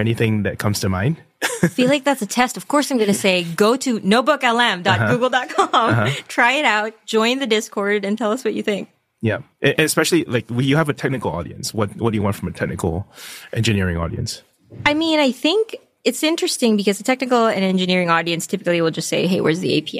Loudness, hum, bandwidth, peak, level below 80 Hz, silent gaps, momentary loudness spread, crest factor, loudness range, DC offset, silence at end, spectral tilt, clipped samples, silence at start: -19 LUFS; none; 15.5 kHz; -2 dBFS; -48 dBFS; none; 8 LU; 16 dB; 5 LU; under 0.1%; 0 s; -4.5 dB/octave; under 0.1%; 0 s